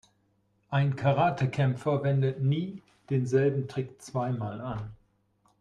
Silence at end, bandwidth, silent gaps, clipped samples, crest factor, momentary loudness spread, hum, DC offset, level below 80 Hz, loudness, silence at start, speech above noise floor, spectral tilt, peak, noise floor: 0.65 s; 9.8 kHz; none; under 0.1%; 16 dB; 11 LU; none; under 0.1%; -62 dBFS; -29 LUFS; 0.7 s; 43 dB; -8 dB/octave; -12 dBFS; -70 dBFS